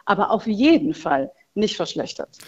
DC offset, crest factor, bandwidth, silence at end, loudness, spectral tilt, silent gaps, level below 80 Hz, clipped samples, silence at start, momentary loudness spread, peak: under 0.1%; 18 dB; 11 kHz; 0.05 s; -21 LUFS; -5 dB/octave; none; -56 dBFS; under 0.1%; 0.05 s; 12 LU; -4 dBFS